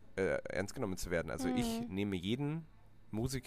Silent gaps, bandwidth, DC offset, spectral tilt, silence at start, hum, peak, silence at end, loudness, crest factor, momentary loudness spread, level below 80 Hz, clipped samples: none; 15.5 kHz; under 0.1%; -5.5 dB/octave; 0.05 s; none; -22 dBFS; 0 s; -38 LUFS; 16 dB; 5 LU; -54 dBFS; under 0.1%